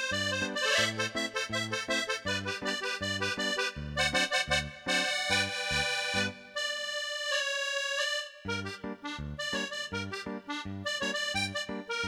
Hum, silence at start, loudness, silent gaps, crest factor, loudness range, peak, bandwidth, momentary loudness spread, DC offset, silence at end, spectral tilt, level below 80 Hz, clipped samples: none; 0 s; -31 LUFS; none; 20 dB; 5 LU; -14 dBFS; 18 kHz; 9 LU; under 0.1%; 0 s; -2.5 dB/octave; -54 dBFS; under 0.1%